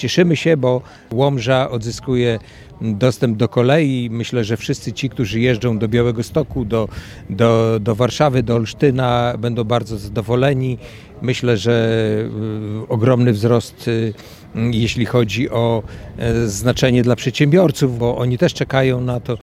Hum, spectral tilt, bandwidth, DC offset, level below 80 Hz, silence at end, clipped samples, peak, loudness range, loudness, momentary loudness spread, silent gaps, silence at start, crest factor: none; -6.5 dB/octave; 14.5 kHz; under 0.1%; -40 dBFS; 0.15 s; under 0.1%; 0 dBFS; 2 LU; -17 LUFS; 10 LU; none; 0 s; 16 dB